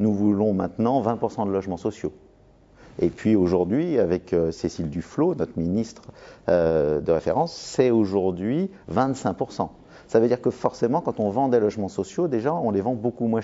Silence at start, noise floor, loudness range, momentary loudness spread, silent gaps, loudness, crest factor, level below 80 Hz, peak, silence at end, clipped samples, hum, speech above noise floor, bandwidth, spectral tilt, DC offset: 0 s; -54 dBFS; 2 LU; 8 LU; none; -24 LUFS; 18 dB; -52 dBFS; -4 dBFS; 0 s; under 0.1%; none; 31 dB; 8 kHz; -7.5 dB/octave; under 0.1%